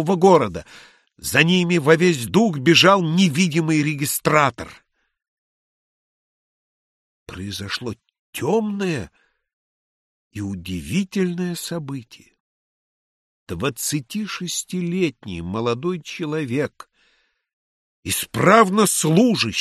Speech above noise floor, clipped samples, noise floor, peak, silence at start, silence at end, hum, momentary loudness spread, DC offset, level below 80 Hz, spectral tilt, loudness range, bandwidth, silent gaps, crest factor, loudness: 44 dB; under 0.1%; -64 dBFS; 0 dBFS; 0 s; 0 s; none; 18 LU; under 0.1%; -54 dBFS; -4.5 dB/octave; 12 LU; 13 kHz; 5.28-7.26 s, 8.19-8.33 s, 9.53-10.31 s, 12.40-13.47 s, 17.53-18.03 s; 20 dB; -19 LUFS